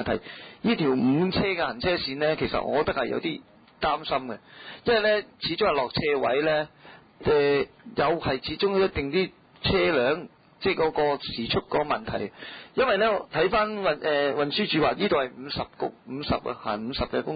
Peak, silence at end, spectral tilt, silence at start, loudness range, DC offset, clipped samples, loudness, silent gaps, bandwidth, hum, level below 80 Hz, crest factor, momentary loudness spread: -12 dBFS; 0 s; -10 dB/octave; 0 s; 2 LU; under 0.1%; under 0.1%; -26 LUFS; none; 5 kHz; none; -50 dBFS; 14 dB; 10 LU